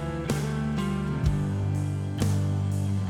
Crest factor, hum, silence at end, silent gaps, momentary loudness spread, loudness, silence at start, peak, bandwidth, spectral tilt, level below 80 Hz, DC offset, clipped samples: 14 dB; none; 0 s; none; 2 LU; -28 LUFS; 0 s; -12 dBFS; 14.5 kHz; -7 dB/octave; -40 dBFS; under 0.1%; under 0.1%